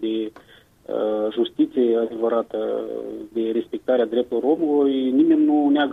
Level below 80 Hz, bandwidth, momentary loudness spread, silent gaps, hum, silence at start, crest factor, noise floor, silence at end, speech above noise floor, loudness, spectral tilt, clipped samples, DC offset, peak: -64 dBFS; 4 kHz; 11 LU; none; none; 0 s; 12 dB; -51 dBFS; 0 s; 31 dB; -21 LUFS; -7 dB/octave; under 0.1%; under 0.1%; -8 dBFS